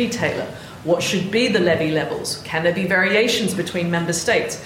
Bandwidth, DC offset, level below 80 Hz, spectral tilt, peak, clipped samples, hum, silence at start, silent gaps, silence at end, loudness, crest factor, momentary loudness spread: 16.5 kHz; under 0.1%; -52 dBFS; -4 dB/octave; -6 dBFS; under 0.1%; none; 0 s; none; 0 s; -19 LUFS; 14 dB; 8 LU